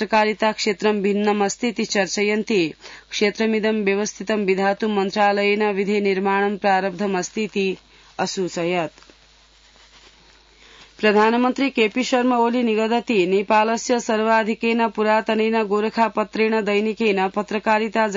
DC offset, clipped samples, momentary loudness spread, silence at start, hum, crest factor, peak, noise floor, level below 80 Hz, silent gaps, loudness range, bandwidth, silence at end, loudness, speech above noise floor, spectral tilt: under 0.1%; under 0.1%; 6 LU; 0 s; none; 16 dB; -6 dBFS; -53 dBFS; -60 dBFS; none; 6 LU; 7.8 kHz; 0 s; -20 LUFS; 33 dB; -4.5 dB/octave